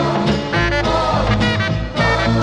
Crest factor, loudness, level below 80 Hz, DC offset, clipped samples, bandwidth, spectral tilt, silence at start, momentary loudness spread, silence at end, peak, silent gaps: 14 dB; -17 LUFS; -28 dBFS; under 0.1%; under 0.1%; 10 kHz; -6 dB/octave; 0 s; 2 LU; 0 s; -2 dBFS; none